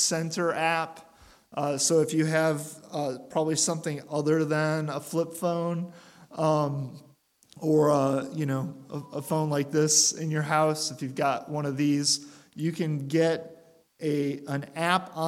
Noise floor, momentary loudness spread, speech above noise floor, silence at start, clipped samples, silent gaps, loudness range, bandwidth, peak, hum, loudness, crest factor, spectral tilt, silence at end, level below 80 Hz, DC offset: -56 dBFS; 11 LU; 29 dB; 0 s; under 0.1%; none; 3 LU; 16 kHz; -8 dBFS; none; -27 LUFS; 20 dB; -4 dB/octave; 0 s; -74 dBFS; under 0.1%